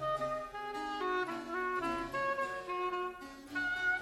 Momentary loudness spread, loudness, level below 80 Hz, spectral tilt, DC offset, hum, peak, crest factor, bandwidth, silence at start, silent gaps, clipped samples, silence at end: 6 LU; -37 LUFS; -62 dBFS; -4 dB/octave; under 0.1%; none; -24 dBFS; 14 dB; 14 kHz; 0 s; none; under 0.1%; 0 s